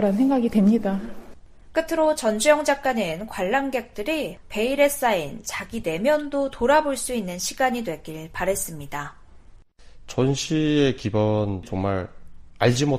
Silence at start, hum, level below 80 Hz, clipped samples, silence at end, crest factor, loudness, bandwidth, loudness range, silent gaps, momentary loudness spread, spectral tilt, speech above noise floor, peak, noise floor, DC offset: 0 s; none; -46 dBFS; under 0.1%; 0 s; 18 dB; -23 LUFS; 15.5 kHz; 4 LU; none; 11 LU; -5 dB/octave; 25 dB; -4 dBFS; -47 dBFS; under 0.1%